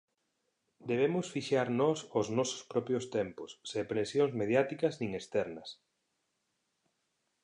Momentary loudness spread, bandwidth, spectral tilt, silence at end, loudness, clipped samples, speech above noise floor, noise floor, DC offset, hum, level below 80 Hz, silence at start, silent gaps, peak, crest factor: 10 LU; 11 kHz; -5.5 dB/octave; 1.7 s; -33 LUFS; under 0.1%; 49 dB; -81 dBFS; under 0.1%; none; -72 dBFS; 0.85 s; none; -14 dBFS; 20 dB